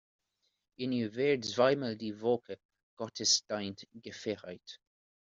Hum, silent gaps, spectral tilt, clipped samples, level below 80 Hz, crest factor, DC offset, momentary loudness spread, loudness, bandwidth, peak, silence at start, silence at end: none; 2.65-2.69 s, 2.83-2.97 s; -3 dB/octave; under 0.1%; -78 dBFS; 22 dB; under 0.1%; 20 LU; -32 LUFS; 7.6 kHz; -14 dBFS; 0.8 s; 0.55 s